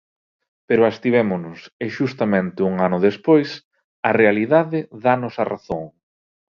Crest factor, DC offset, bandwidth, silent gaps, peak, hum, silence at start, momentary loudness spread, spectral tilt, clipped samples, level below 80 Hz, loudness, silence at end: 20 dB; under 0.1%; 6.8 kHz; 1.72-1.80 s, 3.65-3.71 s, 3.84-4.03 s; 0 dBFS; none; 0.7 s; 13 LU; -8 dB/octave; under 0.1%; -58 dBFS; -19 LUFS; 0.7 s